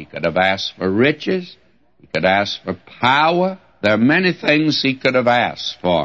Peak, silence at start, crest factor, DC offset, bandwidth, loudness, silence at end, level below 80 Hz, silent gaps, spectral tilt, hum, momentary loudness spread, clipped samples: -2 dBFS; 0 s; 16 dB; 0.1%; 7.8 kHz; -17 LUFS; 0 s; -54 dBFS; none; -5.5 dB/octave; none; 8 LU; under 0.1%